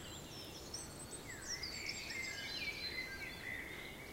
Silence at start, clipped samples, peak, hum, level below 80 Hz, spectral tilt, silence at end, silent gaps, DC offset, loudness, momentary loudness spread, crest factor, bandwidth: 0 s; under 0.1%; -28 dBFS; none; -62 dBFS; -2 dB/octave; 0 s; none; under 0.1%; -44 LUFS; 7 LU; 18 dB; 16 kHz